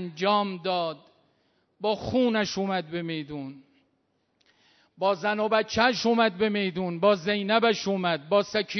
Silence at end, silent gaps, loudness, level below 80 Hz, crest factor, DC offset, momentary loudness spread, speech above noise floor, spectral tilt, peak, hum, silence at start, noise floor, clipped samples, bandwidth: 0 s; none; -26 LUFS; -62 dBFS; 20 dB; under 0.1%; 10 LU; 47 dB; -5 dB/octave; -8 dBFS; none; 0 s; -72 dBFS; under 0.1%; 6.4 kHz